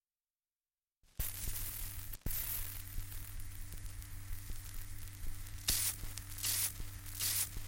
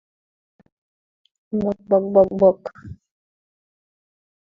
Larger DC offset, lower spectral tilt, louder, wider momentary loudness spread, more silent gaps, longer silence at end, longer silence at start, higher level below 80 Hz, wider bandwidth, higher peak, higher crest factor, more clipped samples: neither; second, -1 dB/octave vs -10.5 dB/octave; second, -40 LUFS vs -19 LUFS; about the same, 15 LU vs 14 LU; neither; second, 0 s vs 1.6 s; second, 1.2 s vs 1.55 s; first, -46 dBFS vs -54 dBFS; first, 17 kHz vs 5.2 kHz; second, -20 dBFS vs -2 dBFS; about the same, 22 dB vs 22 dB; neither